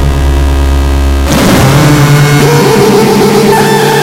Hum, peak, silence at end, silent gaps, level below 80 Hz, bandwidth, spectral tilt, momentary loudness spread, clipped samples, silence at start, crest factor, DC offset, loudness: none; 0 dBFS; 0 s; none; -12 dBFS; 16.5 kHz; -5.5 dB/octave; 4 LU; 4%; 0 s; 6 dB; under 0.1%; -6 LUFS